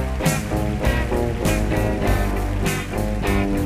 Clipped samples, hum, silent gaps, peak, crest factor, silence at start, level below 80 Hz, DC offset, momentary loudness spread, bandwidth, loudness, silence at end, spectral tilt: under 0.1%; none; none; -6 dBFS; 14 dB; 0 s; -26 dBFS; under 0.1%; 3 LU; 15.5 kHz; -22 LUFS; 0 s; -5.5 dB/octave